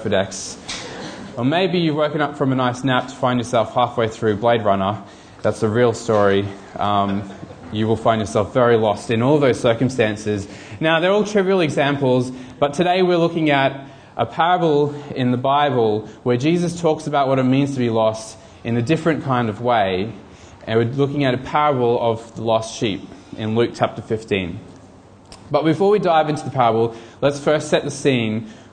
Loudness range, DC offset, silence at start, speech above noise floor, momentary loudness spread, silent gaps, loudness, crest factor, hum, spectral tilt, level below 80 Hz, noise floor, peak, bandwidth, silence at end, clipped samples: 3 LU; under 0.1%; 0 s; 26 dB; 12 LU; none; -19 LUFS; 18 dB; none; -6 dB/octave; -52 dBFS; -44 dBFS; -2 dBFS; 10 kHz; 0.1 s; under 0.1%